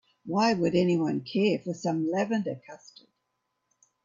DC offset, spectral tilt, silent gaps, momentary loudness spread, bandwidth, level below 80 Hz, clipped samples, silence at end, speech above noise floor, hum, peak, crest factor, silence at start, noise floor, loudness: under 0.1%; -6.5 dB/octave; none; 13 LU; 7.6 kHz; -70 dBFS; under 0.1%; 1.3 s; 52 dB; none; -12 dBFS; 16 dB; 0.25 s; -80 dBFS; -27 LUFS